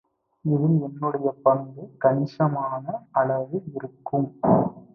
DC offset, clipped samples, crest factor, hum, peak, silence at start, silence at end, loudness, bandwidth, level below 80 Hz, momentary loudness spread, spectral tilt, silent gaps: under 0.1%; under 0.1%; 20 dB; none; -4 dBFS; 0.45 s; 0.15 s; -24 LUFS; 5.8 kHz; -62 dBFS; 10 LU; -11.5 dB/octave; none